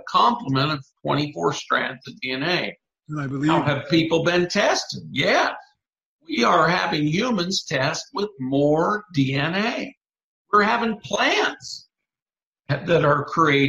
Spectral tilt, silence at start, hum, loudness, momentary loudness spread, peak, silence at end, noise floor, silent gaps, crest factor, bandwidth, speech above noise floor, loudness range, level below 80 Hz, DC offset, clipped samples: -5 dB/octave; 0.05 s; none; -22 LUFS; 10 LU; -4 dBFS; 0 s; under -90 dBFS; 6.05-6.19 s, 9.97-10.01 s, 10.23-10.45 s, 12.22-12.26 s, 12.45-12.53 s; 20 dB; 13 kHz; over 69 dB; 3 LU; -58 dBFS; under 0.1%; under 0.1%